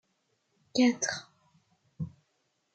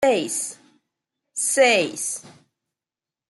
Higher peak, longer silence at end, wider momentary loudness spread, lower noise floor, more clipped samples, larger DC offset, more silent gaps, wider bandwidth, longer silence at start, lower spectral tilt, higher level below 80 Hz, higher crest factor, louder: second, -14 dBFS vs -4 dBFS; second, 0.65 s vs 1 s; about the same, 16 LU vs 16 LU; second, -76 dBFS vs -90 dBFS; neither; neither; neither; second, 9 kHz vs 12.5 kHz; first, 0.75 s vs 0 s; first, -3.5 dB/octave vs -1.5 dB/octave; about the same, -70 dBFS vs -70 dBFS; about the same, 20 dB vs 20 dB; second, -31 LUFS vs -21 LUFS